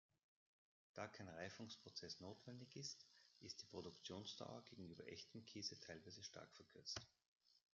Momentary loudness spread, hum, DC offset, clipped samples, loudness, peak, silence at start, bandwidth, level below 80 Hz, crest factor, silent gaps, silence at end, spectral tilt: 9 LU; none; under 0.1%; under 0.1%; -56 LUFS; -34 dBFS; 0.95 s; 7.4 kHz; -88 dBFS; 24 dB; 7.28-7.40 s; 0.15 s; -3 dB/octave